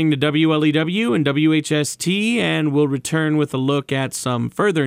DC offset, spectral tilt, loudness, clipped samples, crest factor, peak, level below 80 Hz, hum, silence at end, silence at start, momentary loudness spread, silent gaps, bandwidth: under 0.1%; -5.5 dB/octave; -19 LUFS; under 0.1%; 14 dB; -4 dBFS; -60 dBFS; none; 0 s; 0 s; 5 LU; none; 16 kHz